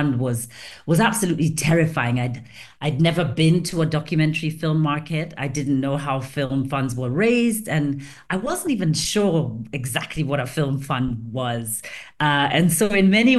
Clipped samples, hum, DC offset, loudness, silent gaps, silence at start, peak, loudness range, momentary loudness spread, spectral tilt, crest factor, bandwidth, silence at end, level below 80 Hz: under 0.1%; none; 0.2%; -21 LUFS; none; 0 s; -4 dBFS; 3 LU; 10 LU; -5 dB/octave; 16 dB; 12.5 kHz; 0 s; -48 dBFS